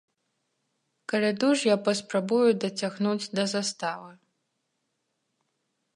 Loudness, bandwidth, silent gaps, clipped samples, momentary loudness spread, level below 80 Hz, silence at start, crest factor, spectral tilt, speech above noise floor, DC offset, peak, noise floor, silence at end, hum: -26 LUFS; 11.5 kHz; none; under 0.1%; 10 LU; -80 dBFS; 1.1 s; 18 dB; -4.5 dB/octave; 53 dB; under 0.1%; -10 dBFS; -78 dBFS; 1.85 s; none